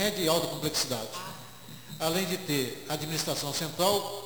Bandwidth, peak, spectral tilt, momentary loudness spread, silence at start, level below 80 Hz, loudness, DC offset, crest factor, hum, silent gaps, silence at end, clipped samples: over 20 kHz; -10 dBFS; -3 dB/octave; 15 LU; 0 s; -62 dBFS; -29 LUFS; 0.2%; 22 dB; none; none; 0 s; under 0.1%